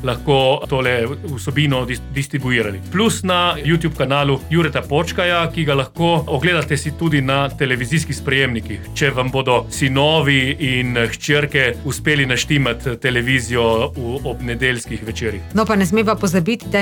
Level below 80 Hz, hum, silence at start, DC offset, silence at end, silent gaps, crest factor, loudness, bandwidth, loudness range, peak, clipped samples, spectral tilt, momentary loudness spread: -36 dBFS; none; 0 s; under 0.1%; 0 s; none; 14 dB; -17 LUFS; 18.5 kHz; 2 LU; -4 dBFS; under 0.1%; -5 dB/octave; 7 LU